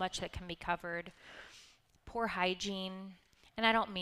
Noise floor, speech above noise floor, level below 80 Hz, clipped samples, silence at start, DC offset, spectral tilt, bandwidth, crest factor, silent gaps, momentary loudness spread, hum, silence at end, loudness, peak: -63 dBFS; 26 dB; -60 dBFS; under 0.1%; 0 s; under 0.1%; -3.5 dB/octave; 15 kHz; 24 dB; none; 22 LU; none; 0 s; -36 LUFS; -14 dBFS